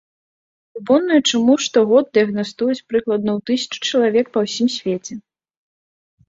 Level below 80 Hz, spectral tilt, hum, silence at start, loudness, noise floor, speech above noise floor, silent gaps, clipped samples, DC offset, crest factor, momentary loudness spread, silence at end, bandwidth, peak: -62 dBFS; -4 dB/octave; none; 0.75 s; -18 LUFS; under -90 dBFS; over 73 dB; none; under 0.1%; under 0.1%; 16 dB; 10 LU; 1.1 s; 7.8 kHz; -2 dBFS